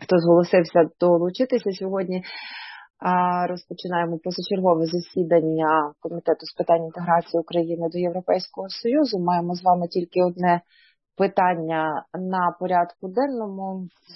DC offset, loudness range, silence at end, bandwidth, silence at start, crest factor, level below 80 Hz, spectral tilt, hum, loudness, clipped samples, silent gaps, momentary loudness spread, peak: under 0.1%; 2 LU; 0 s; 6 kHz; 0 s; 18 dB; -72 dBFS; -8 dB/octave; none; -23 LUFS; under 0.1%; none; 10 LU; -4 dBFS